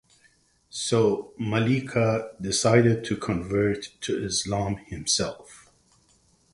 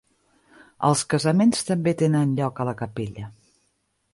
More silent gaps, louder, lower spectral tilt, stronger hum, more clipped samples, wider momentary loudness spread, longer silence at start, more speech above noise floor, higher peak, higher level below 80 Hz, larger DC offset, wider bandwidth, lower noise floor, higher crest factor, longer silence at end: neither; about the same, -25 LUFS vs -23 LUFS; about the same, -4.5 dB/octave vs -5.5 dB/octave; neither; neither; about the same, 11 LU vs 13 LU; about the same, 0.75 s vs 0.8 s; second, 38 dB vs 49 dB; about the same, -4 dBFS vs -6 dBFS; first, -52 dBFS vs -58 dBFS; neither; about the same, 11.5 kHz vs 11.5 kHz; second, -63 dBFS vs -71 dBFS; about the same, 22 dB vs 18 dB; about the same, 0.95 s vs 0.85 s